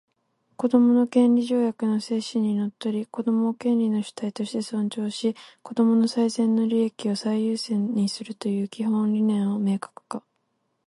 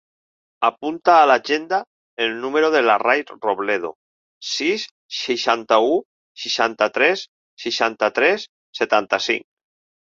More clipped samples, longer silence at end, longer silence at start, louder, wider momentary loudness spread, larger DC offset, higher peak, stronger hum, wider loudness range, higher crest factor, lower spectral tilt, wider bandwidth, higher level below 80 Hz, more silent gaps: neither; about the same, 0.7 s vs 0.7 s; about the same, 0.6 s vs 0.6 s; second, -24 LUFS vs -19 LUFS; about the same, 10 LU vs 11 LU; neither; second, -8 dBFS vs -2 dBFS; neither; about the same, 3 LU vs 3 LU; about the same, 16 dB vs 18 dB; first, -6.5 dB/octave vs -2.5 dB/octave; first, 11.5 kHz vs 7.6 kHz; about the same, -74 dBFS vs -70 dBFS; second, none vs 1.87-2.17 s, 3.95-4.41 s, 4.91-5.09 s, 6.05-6.35 s, 7.28-7.57 s, 8.49-8.73 s